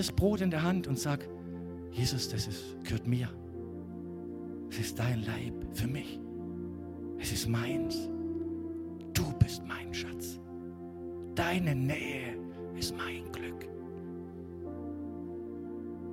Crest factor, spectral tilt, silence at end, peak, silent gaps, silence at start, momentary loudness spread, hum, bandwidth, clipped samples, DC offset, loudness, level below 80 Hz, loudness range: 24 dB; -5.5 dB/octave; 0 s; -12 dBFS; none; 0 s; 12 LU; none; 16.5 kHz; under 0.1%; under 0.1%; -36 LUFS; -52 dBFS; 4 LU